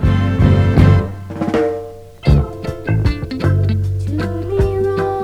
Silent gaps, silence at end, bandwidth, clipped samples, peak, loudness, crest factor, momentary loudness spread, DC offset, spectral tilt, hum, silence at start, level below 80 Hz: none; 0 s; 7.6 kHz; under 0.1%; 0 dBFS; -16 LUFS; 14 dB; 12 LU; under 0.1%; -8.5 dB/octave; none; 0 s; -24 dBFS